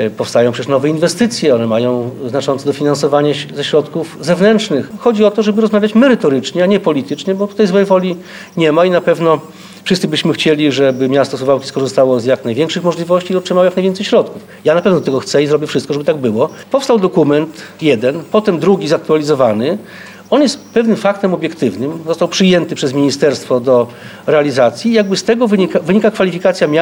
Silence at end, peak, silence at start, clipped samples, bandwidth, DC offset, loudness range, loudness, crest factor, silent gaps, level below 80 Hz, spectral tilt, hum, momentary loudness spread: 0 s; 0 dBFS; 0 s; under 0.1%; 18.5 kHz; under 0.1%; 2 LU; -13 LUFS; 12 dB; none; -58 dBFS; -5.5 dB/octave; none; 6 LU